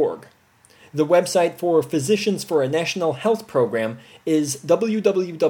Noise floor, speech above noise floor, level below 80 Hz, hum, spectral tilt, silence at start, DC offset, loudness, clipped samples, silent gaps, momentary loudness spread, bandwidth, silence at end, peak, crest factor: -55 dBFS; 35 dB; -70 dBFS; none; -5 dB/octave; 0 s; under 0.1%; -21 LUFS; under 0.1%; none; 7 LU; 17.5 kHz; 0 s; -4 dBFS; 16 dB